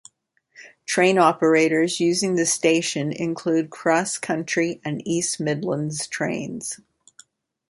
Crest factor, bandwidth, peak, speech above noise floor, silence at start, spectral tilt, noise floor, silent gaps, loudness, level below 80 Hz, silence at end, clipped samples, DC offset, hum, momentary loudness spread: 20 dB; 11.5 kHz; -4 dBFS; 41 dB; 0.6 s; -4 dB/octave; -63 dBFS; none; -22 LUFS; -68 dBFS; 0.95 s; under 0.1%; under 0.1%; none; 11 LU